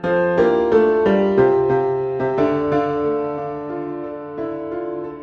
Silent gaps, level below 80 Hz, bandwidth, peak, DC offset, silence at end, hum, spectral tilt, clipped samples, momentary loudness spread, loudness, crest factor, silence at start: none; -50 dBFS; 6.6 kHz; -4 dBFS; under 0.1%; 0 s; none; -8.5 dB/octave; under 0.1%; 12 LU; -19 LUFS; 16 dB; 0 s